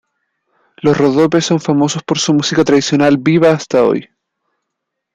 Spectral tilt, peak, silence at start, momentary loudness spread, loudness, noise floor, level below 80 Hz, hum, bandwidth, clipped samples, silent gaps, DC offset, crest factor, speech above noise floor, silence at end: -5 dB/octave; -2 dBFS; 0.85 s; 4 LU; -13 LUFS; -76 dBFS; -54 dBFS; none; 9.4 kHz; under 0.1%; none; under 0.1%; 12 dB; 64 dB; 1.1 s